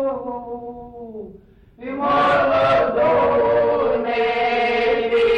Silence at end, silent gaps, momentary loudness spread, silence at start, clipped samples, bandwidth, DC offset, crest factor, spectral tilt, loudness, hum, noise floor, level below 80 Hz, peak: 0 s; none; 19 LU; 0 s; under 0.1%; 8 kHz; under 0.1%; 10 dB; -6 dB/octave; -18 LUFS; none; -46 dBFS; -48 dBFS; -8 dBFS